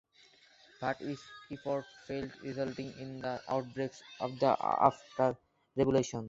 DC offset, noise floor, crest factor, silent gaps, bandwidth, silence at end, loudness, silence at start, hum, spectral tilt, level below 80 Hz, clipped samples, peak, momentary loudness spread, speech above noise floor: under 0.1%; -64 dBFS; 24 dB; none; 8 kHz; 0 s; -35 LUFS; 0.8 s; none; -6 dB/octave; -66 dBFS; under 0.1%; -10 dBFS; 13 LU; 30 dB